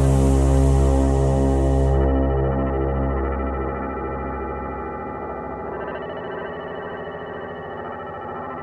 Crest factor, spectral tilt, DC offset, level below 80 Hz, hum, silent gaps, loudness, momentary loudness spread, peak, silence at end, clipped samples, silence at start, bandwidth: 14 dB; -8 dB/octave; under 0.1%; -24 dBFS; none; none; -23 LUFS; 14 LU; -6 dBFS; 0 s; under 0.1%; 0 s; 11 kHz